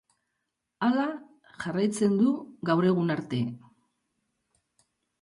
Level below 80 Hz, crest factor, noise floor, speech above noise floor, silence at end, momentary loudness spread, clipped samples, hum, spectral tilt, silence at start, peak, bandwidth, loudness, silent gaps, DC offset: -72 dBFS; 18 dB; -82 dBFS; 56 dB; 1.65 s; 11 LU; under 0.1%; none; -6.5 dB/octave; 0.8 s; -12 dBFS; 11.5 kHz; -27 LUFS; none; under 0.1%